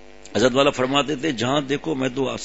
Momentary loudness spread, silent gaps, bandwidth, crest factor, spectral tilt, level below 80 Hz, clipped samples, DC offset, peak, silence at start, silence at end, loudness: 7 LU; none; 8 kHz; 18 dB; -4.5 dB/octave; -52 dBFS; under 0.1%; 0.6%; -4 dBFS; 0.25 s; 0 s; -21 LUFS